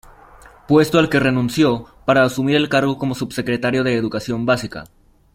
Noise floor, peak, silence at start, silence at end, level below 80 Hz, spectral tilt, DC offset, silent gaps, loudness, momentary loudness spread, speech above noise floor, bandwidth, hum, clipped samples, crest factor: -45 dBFS; -2 dBFS; 0.7 s; 0.5 s; -48 dBFS; -6 dB/octave; under 0.1%; none; -18 LUFS; 8 LU; 27 dB; 16 kHz; none; under 0.1%; 18 dB